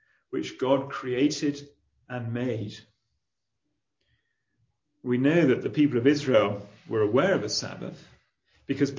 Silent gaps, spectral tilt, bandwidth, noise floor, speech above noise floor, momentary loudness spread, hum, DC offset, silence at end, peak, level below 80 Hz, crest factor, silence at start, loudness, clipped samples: none; -6 dB/octave; 7.6 kHz; -84 dBFS; 58 dB; 17 LU; none; under 0.1%; 0 s; -6 dBFS; -66 dBFS; 20 dB; 0.3 s; -26 LUFS; under 0.1%